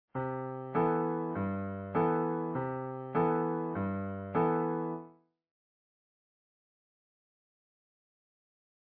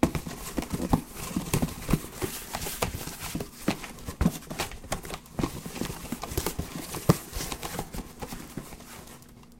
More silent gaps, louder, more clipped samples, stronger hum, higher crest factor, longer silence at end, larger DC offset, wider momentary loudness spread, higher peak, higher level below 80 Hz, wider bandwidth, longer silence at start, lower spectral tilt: neither; about the same, -33 LUFS vs -32 LUFS; neither; neither; second, 16 dB vs 28 dB; first, 3.85 s vs 0 s; neither; second, 8 LU vs 11 LU; second, -18 dBFS vs -4 dBFS; second, -70 dBFS vs -42 dBFS; second, 4.5 kHz vs 17 kHz; first, 0.15 s vs 0 s; first, -8.5 dB/octave vs -5 dB/octave